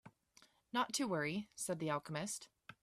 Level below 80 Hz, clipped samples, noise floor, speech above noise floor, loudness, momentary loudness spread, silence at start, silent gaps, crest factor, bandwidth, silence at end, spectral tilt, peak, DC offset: -80 dBFS; under 0.1%; -70 dBFS; 30 dB; -41 LUFS; 7 LU; 0.05 s; none; 18 dB; 15.5 kHz; 0.1 s; -3.5 dB/octave; -24 dBFS; under 0.1%